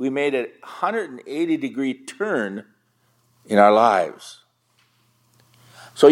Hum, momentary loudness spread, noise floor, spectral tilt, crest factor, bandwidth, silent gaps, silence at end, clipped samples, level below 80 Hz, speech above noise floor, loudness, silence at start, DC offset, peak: none; 19 LU; -64 dBFS; -5.5 dB/octave; 20 dB; 13 kHz; none; 0 s; under 0.1%; -80 dBFS; 43 dB; -21 LUFS; 0 s; under 0.1%; 0 dBFS